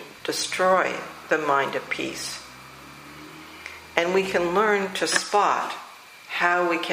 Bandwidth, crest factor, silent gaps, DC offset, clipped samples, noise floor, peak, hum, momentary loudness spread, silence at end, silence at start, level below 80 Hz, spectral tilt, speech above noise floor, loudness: 15.5 kHz; 24 dB; none; under 0.1%; under 0.1%; -44 dBFS; -2 dBFS; none; 21 LU; 0 s; 0 s; -62 dBFS; -3 dB/octave; 20 dB; -23 LUFS